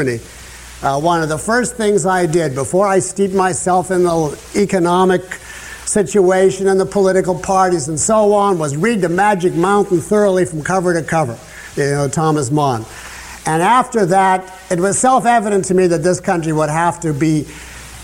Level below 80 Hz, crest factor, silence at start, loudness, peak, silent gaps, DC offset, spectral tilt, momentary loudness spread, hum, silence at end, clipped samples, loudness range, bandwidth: -44 dBFS; 12 dB; 0 s; -15 LUFS; -2 dBFS; none; under 0.1%; -5 dB/octave; 11 LU; none; 0 s; under 0.1%; 2 LU; 16 kHz